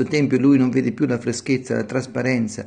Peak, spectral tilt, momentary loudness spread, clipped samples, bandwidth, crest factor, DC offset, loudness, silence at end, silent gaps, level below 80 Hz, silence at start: -6 dBFS; -6.5 dB/octave; 8 LU; under 0.1%; 9.8 kHz; 14 dB; under 0.1%; -20 LUFS; 0 s; none; -58 dBFS; 0 s